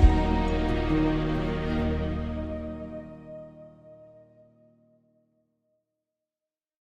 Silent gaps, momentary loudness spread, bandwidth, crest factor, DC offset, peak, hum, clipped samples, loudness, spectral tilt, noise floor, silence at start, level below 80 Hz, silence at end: none; 19 LU; 8.2 kHz; 22 dB; under 0.1%; -6 dBFS; none; under 0.1%; -28 LUFS; -8 dB/octave; under -90 dBFS; 0 s; -32 dBFS; 2.9 s